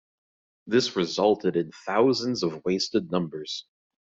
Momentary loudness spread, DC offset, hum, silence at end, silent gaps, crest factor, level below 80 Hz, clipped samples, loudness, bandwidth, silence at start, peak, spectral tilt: 9 LU; under 0.1%; none; 0.5 s; none; 18 dB; -66 dBFS; under 0.1%; -26 LUFS; 7.8 kHz; 0.65 s; -8 dBFS; -5 dB/octave